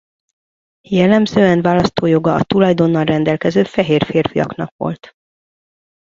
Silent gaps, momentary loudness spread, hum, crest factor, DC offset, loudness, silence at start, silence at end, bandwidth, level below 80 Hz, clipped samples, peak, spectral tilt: 4.71-4.79 s; 10 LU; none; 16 dB; under 0.1%; -15 LUFS; 0.9 s; 1.2 s; 7.6 kHz; -46 dBFS; under 0.1%; 0 dBFS; -7.5 dB/octave